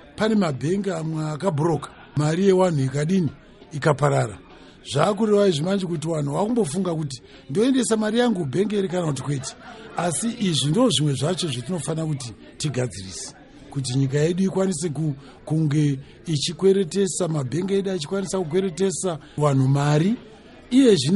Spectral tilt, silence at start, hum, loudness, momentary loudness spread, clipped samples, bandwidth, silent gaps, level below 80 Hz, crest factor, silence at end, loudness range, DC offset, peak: -5.5 dB/octave; 0.15 s; none; -23 LUFS; 11 LU; under 0.1%; 11.5 kHz; none; -54 dBFS; 18 dB; 0 s; 3 LU; under 0.1%; -6 dBFS